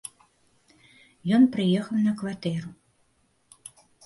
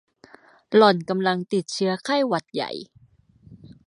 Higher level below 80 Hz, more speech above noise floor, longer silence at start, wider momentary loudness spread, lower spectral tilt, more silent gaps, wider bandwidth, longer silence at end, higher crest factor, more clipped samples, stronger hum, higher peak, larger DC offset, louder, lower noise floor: about the same, -68 dBFS vs -68 dBFS; first, 44 dB vs 35 dB; first, 1.25 s vs 0.7 s; first, 26 LU vs 13 LU; first, -6.5 dB/octave vs -5 dB/octave; neither; about the same, 11.5 kHz vs 11 kHz; first, 1.35 s vs 0.15 s; about the same, 18 dB vs 22 dB; neither; neither; second, -10 dBFS vs -2 dBFS; neither; second, -25 LUFS vs -22 LUFS; first, -67 dBFS vs -56 dBFS